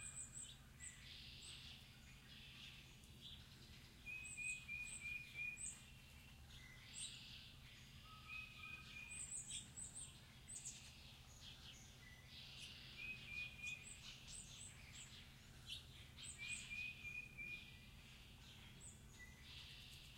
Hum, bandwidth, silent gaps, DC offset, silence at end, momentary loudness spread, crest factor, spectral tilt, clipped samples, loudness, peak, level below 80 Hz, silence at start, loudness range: none; 16 kHz; none; under 0.1%; 0 s; 13 LU; 20 dB; -1 dB/octave; under 0.1%; -54 LUFS; -36 dBFS; -68 dBFS; 0 s; 5 LU